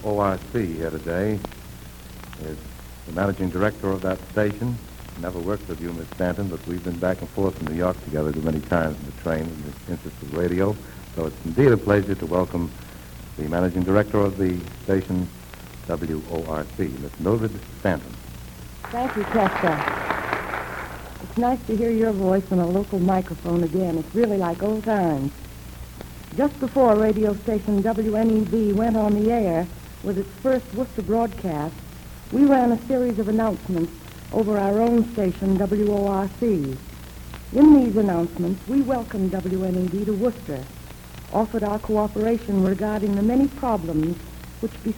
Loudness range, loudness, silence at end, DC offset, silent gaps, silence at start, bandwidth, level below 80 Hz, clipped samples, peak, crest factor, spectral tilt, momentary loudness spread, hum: 7 LU; -23 LUFS; 0 s; under 0.1%; none; 0 s; 19 kHz; -42 dBFS; under 0.1%; -2 dBFS; 20 dB; -7.5 dB/octave; 17 LU; none